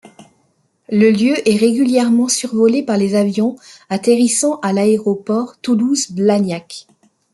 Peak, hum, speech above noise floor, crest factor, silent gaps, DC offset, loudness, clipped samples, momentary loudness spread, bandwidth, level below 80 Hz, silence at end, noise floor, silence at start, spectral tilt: -2 dBFS; none; 46 dB; 14 dB; none; under 0.1%; -15 LUFS; under 0.1%; 7 LU; 12 kHz; -62 dBFS; 0.55 s; -61 dBFS; 0.9 s; -5 dB/octave